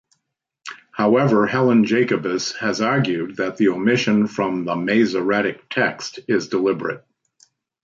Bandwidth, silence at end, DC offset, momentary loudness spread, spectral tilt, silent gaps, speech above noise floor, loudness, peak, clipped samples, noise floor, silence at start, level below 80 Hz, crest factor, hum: 7.6 kHz; 0.85 s; under 0.1%; 10 LU; -5.5 dB/octave; none; 59 dB; -19 LUFS; -4 dBFS; under 0.1%; -78 dBFS; 0.65 s; -64 dBFS; 16 dB; none